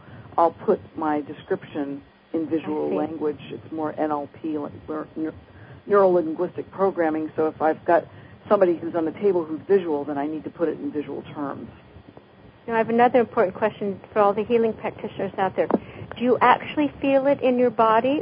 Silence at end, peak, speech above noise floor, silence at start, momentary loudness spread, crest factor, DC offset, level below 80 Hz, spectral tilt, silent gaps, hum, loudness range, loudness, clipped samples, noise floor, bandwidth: 0 s; -2 dBFS; 26 dB; 0.05 s; 13 LU; 22 dB; under 0.1%; -58 dBFS; -11 dB/octave; none; none; 6 LU; -23 LUFS; under 0.1%; -48 dBFS; 5.2 kHz